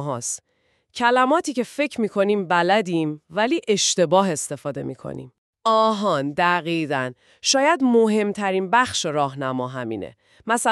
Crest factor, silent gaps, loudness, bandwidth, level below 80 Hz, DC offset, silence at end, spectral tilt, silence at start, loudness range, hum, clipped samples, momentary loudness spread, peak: 18 dB; 5.38-5.53 s; -21 LUFS; 13.5 kHz; -66 dBFS; under 0.1%; 0 s; -3.5 dB/octave; 0 s; 2 LU; none; under 0.1%; 14 LU; -4 dBFS